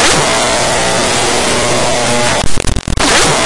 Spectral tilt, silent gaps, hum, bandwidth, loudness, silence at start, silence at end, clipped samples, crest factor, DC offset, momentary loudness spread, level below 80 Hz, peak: -2.5 dB/octave; none; none; 12 kHz; -11 LUFS; 0 s; 0 s; under 0.1%; 12 dB; 8%; 5 LU; -24 dBFS; 0 dBFS